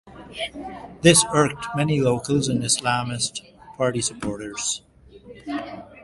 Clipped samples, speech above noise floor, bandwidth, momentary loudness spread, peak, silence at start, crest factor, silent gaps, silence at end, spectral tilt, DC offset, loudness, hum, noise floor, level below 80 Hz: under 0.1%; 23 dB; 12 kHz; 20 LU; 0 dBFS; 0.05 s; 24 dB; none; 0 s; -4 dB/octave; under 0.1%; -22 LUFS; none; -46 dBFS; -50 dBFS